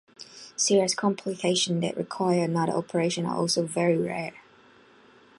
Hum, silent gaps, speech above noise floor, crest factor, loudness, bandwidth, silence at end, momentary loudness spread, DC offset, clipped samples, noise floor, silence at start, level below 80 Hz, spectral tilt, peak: none; none; 30 dB; 16 dB; -26 LUFS; 11.5 kHz; 1 s; 11 LU; under 0.1%; under 0.1%; -56 dBFS; 0.2 s; -72 dBFS; -4 dB/octave; -10 dBFS